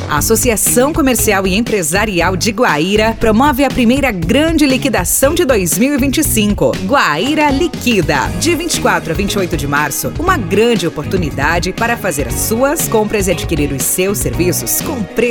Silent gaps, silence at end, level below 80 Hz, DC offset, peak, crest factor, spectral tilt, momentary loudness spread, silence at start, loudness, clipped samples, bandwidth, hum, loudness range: none; 0 s; -28 dBFS; under 0.1%; 0 dBFS; 12 dB; -4 dB/octave; 4 LU; 0 s; -13 LUFS; under 0.1%; 19.5 kHz; none; 3 LU